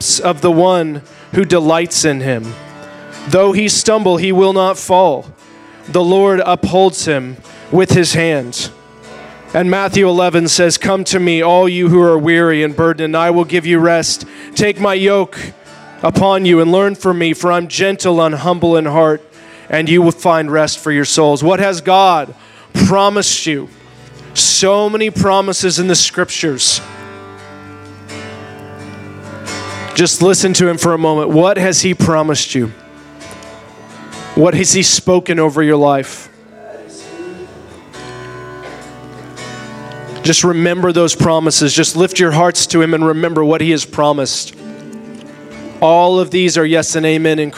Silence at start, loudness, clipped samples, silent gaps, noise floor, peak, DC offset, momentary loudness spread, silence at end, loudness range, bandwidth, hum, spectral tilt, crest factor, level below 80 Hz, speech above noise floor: 0 s; -12 LUFS; under 0.1%; none; -39 dBFS; 0 dBFS; under 0.1%; 21 LU; 0 s; 5 LU; 15 kHz; none; -4 dB/octave; 14 dB; -48 dBFS; 27 dB